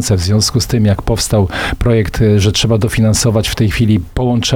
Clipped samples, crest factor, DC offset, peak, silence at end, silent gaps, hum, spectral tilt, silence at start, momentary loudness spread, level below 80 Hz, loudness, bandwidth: under 0.1%; 12 dB; 0.5%; 0 dBFS; 0 s; none; none; -5 dB/octave; 0 s; 3 LU; -26 dBFS; -13 LUFS; 16.5 kHz